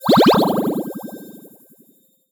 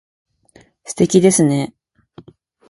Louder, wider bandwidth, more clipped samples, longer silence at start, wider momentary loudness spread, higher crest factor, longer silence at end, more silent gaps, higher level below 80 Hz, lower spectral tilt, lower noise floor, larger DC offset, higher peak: about the same, -16 LUFS vs -14 LUFS; first, over 20 kHz vs 11.5 kHz; neither; second, 0 s vs 0.9 s; first, 22 LU vs 17 LU; about the same, 14 dB vs 18 dB; about the same, 1 s vs 1.05 s; neither; about the same, -54 dBFS vs -56 dBFS; about the same, -6 dB/octave vs -5.5 dB/octave; first, -56 dBFS vs -51 dBFS; neither; second, -4 dBFS vs 0 dBFS